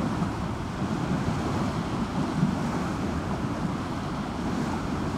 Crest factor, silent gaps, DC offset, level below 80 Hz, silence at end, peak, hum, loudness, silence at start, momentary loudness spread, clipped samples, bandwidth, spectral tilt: 16 dB; none; under 0.1%; -42 dBFS; 0 s; -12 dBFS; none; -29 LUFS; 0 s; 5 LU; under 0.1%; 15 kHz; -6.5 dB/octave